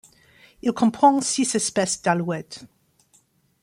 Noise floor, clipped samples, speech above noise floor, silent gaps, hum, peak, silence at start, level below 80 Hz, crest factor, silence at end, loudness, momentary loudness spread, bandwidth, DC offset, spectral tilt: -62 dBFS; under 0.1%; 40 dB; none; none; -4 dBFS; 0.65 s; -64 dBFS; 20 dB; 0.95 s; -21 LUFS; 13 LU; 16 kHz; under 0.1%; -4 dB/octave